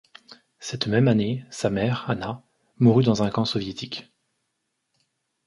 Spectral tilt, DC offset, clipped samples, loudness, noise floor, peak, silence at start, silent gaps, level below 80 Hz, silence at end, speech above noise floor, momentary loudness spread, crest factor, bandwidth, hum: -6.5 dB/octave; under 0.1%; under 0.1%; -23 LUFS; -77 dBFS; -6 dBFS; 0.3 s; none; -56 dBFS; 1.45 s; 55 dB; 16 LU; 20 dB; 11.5 kHz; none